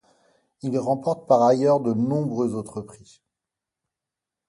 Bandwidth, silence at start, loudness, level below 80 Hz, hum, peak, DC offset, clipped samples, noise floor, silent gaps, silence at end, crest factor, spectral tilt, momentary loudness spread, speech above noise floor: 11.5 kHz; 0.65 s; -22 LUFS; -66 dBFS; none; -6 dBFS; under 0.1%; under 0.1%; -87 dBFS; none; 1.55 s; 20 dB; -8 dB/octave; 17 LU; 65 dB